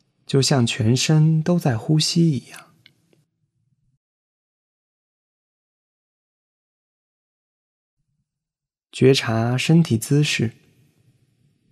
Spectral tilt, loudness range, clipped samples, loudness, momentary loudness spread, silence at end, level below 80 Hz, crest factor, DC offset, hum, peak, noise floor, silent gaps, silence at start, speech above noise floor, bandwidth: -5.5 dB/octave; 6 LU; under 0.1%; -19 LUFS; 6 LU; 1.2 s; -60 dBFS; 20 dB; under 0.1%; none; -2 dBFS; -88 dBFS; 3.97-7.97 s; 0.3 s; 70 dB; 13.5 kHz